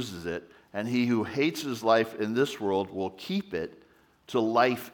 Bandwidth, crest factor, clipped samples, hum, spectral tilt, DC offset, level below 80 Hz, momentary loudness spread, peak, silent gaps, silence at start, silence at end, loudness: over 20 kHz; 20 dB; under 0.1%; none; -5.5 dB/octave; under 0.1%; -70 dBFS; 11 LU; -8 dBFS; none; 0 s; 0.05 s; -28 LUFS